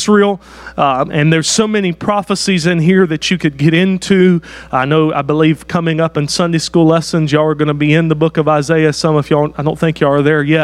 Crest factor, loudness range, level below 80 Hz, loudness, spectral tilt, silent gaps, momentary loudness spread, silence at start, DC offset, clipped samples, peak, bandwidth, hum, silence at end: 12 dB; 1 LU; -44 dBFS; -13 LUFS; -5.5 dB/octave; none; 5 LU; 0 s; under 0.1%; under 0.1%; 0 dBFS; 12 kHz; none; 0 s